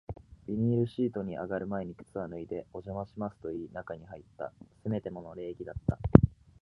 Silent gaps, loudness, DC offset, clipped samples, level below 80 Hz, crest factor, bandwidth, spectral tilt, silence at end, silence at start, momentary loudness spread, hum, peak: none; -32 LUFS; under 0.1%; under 0.1%; -46 dBFS; 32 dB; 5.2 kHz; -11 dB/octave; 0.3 s; 0.1 s; 20 LU; none; 0 dBFS